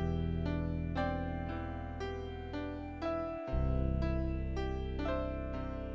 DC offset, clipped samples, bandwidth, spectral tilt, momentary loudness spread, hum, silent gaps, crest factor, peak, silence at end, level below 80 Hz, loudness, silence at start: under 0.1%; under 0.1%; 7.4 kHz; -8.5 dB/octave; 7 LU; none; none; 14 dB; -22 dBFS; 0 s; -40 dBFS; -38 LUFS; 0 s